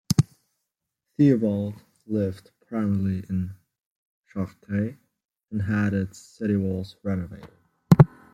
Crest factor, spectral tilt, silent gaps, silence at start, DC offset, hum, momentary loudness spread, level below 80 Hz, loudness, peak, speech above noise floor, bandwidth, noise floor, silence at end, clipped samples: 24 dB; -7.5 dB/octave; 3.79-4.24 s, 5.25-5.29 s; 0.1 s; under 0.1%; none; 16 LU; -54 dBFS; -25 LUFS; -2 dBFS; 57 dB; 15.5 kHz; -82 dBFS; 0.25 s; under 0.1%